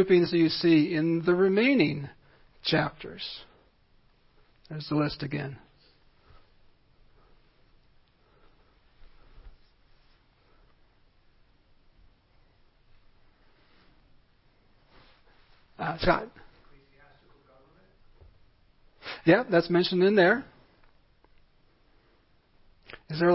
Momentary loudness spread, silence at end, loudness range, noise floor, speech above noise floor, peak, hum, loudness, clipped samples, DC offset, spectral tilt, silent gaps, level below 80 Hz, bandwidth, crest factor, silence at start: 22 LU; 0 s; 10 LU; -64 dBFS; 39 dB; -8 dBFS; none; -26 LUFS; under 0.1%; under 0.1%; -10 dB/octave; none; -56 dBFS; 5.8 kHz; 24 dB; 0 s